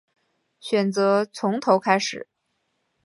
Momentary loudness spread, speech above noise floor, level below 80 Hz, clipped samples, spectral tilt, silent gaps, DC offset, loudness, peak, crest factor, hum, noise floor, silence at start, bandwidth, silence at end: 11 LU; 53 dB; -76 dBFS; under 0.1%; -5 dB/octave; none; under 0.1%; -22 LUFS; -4 dBFS; 22 dB; none; -74 dBFS; 0.65 s; 11.5 kHz; 0.8 s